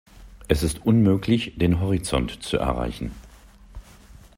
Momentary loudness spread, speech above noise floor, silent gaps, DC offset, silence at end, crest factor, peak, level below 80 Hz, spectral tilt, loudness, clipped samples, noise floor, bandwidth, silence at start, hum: 9 LU; 26 dB; none; under 0.1%; 0.55 s; 20 dB; -2 dBFS; -36 dBFS; -6.5 dB/octave; -23 LUFS; under 0.1%; -48 dBFS; 16 kHz; 0.15 s; none